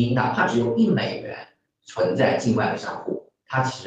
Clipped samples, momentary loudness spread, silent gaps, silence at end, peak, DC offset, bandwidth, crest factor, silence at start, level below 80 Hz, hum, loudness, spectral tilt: under 0.1%; 14 LU; none; 0 s; -6 dBFS; under 0.1%; 8.6 kHz; 18 dB; 0 s; -58 dBFS; none; -23 LUFS; -6.5 dB/octave